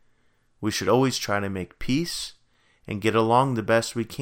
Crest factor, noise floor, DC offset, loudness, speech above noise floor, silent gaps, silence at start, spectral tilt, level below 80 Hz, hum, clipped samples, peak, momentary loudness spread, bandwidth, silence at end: 20 dB; -64 dBFS; under 0.1%; -24 LUFS; 40 dB; none; 0.6 s; -5 dB/octave; -50 dBFS; none; under 0.1%; -6 dBFS; 12 LU; 17 kHz; 0 s